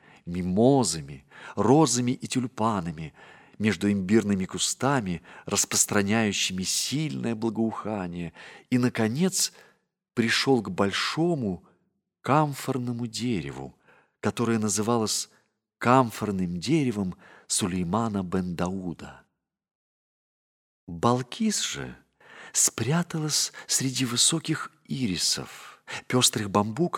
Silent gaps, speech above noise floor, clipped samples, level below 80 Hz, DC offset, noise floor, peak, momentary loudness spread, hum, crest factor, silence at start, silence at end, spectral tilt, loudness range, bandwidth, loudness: 19.75-20.87 s; 47 dB; under 0.1%; -60 dBFS; under 0.1%; -73 dBFS; -4 dBFS; 15 LU; none; 22 dB; 0.25 s; 0 s; -4 dB/octave; 6 LU; 17.5 kHz; -26 LUFS